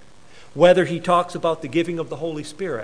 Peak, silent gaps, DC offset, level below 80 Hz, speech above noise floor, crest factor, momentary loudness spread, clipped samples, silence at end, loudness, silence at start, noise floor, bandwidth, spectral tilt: -2 dBFS; none; 0.7%; -58 dBFS; 29 dB; 20 dB; 14 LU; under 0.1%; 0 s; -20 LUFS; 0.55 s; -49 dBFS; 10.5 kHz; -6 dB/octave